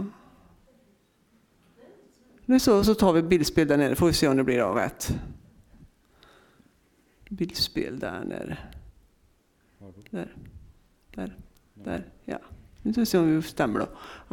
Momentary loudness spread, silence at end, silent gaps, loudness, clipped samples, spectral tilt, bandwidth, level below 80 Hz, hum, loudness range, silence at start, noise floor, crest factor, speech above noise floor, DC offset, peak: 19 LU; 0.1 s; none; -25 LUFS; under 0.1%; -5.5 dB/octave; 19 kHz; -48 dBFS; none; 18 LU; 0 s; -65 dBFS; 20 dB; 40 dB; under 0.1%; -8 dBFS